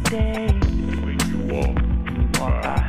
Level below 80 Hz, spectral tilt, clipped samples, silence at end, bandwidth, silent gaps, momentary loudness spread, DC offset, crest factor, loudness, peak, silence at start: -22 dBFS; -5.5 dB/octave; under 0.1%; 0 s; 15.5 kHz; none; 2 LU; under 0.1%; 16 dB; -22 LUFS; -6 dBFS; 0 s